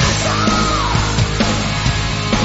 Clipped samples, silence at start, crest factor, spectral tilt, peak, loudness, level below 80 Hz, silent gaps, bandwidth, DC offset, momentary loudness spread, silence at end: under 0.1%; 0 s; 14 dB; -4 dB/octave; -2 dBFS; -16 LUFS; -24 dBFS; none; 8.2 kHz; under 0.1%; 3 LU; 0 s